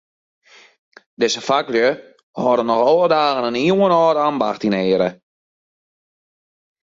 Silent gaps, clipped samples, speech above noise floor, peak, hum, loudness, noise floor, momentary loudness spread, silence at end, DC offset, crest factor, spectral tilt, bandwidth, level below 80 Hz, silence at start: 2.23-2.34 s; under 0.1%; over 74 dB; -4 dBFS; none; -17 LUFS; under -90 dBFS; 7 LU; 1.7 s; under 0.1%; 16 dB; -5 dB/octave; 7.8 kHz; -64 dBFS; 1.2 s